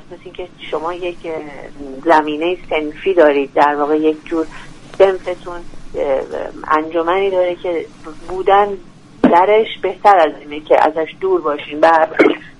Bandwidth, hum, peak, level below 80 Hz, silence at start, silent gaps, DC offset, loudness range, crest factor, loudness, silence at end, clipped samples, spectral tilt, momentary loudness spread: 11 kHz; none; 0 dBFS; -40 dBFS; 0.05 s; none; under 0.1%; 5 LU; 16 dB; -15 LUFS; 0.1 s; under 0.1%; -5.5 dB/octave; 19 LU